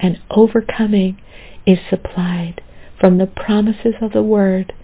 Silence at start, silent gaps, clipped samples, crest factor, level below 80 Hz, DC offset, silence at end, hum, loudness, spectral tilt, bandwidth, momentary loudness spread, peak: 0 s; none; under 0.1%; 16 dB; -40 dBFS; under 0.1%; 0 s; none; -16 LUFS; -12 dB/octave; 4 kHz; 8 LU; 0 dBFS